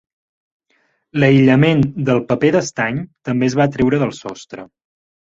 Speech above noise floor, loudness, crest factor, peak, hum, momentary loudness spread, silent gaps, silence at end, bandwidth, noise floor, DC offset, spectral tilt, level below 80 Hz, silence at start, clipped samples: 48 dB; -16 LUFS; 16 dB; -2 dBFS; none; 19 LU; none; 0.65 s; 7.8 kHz; -63 dBFS; under 0.1%; -6.5 dB/octave; -50 dBFS; 1.15 s; under 0.1%